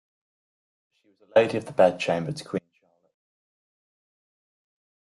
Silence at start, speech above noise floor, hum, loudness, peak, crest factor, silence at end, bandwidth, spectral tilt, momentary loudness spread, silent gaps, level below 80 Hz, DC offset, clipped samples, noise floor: 1.35 s; over 66 dB; none; -24 LUFS; -6 dBFS; 24 dB; 2.5 s; 11.5 kHz; -5.5 dB/octave; 12 LU; none; -72 dBFS; under 0.1%; under 0.1%; under -90 dBFS